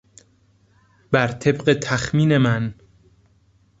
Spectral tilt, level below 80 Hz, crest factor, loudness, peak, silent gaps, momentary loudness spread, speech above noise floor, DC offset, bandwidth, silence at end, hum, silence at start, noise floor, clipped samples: -6 dB/octave; -50 dBFS; 20 dB; -20 LUFS; -2 dBFS; none; 6 LU; 40 dB; under 0.1%; 8 kHz; 1.05 s; none; 1.1 s; -58 dBFS; under 0.1%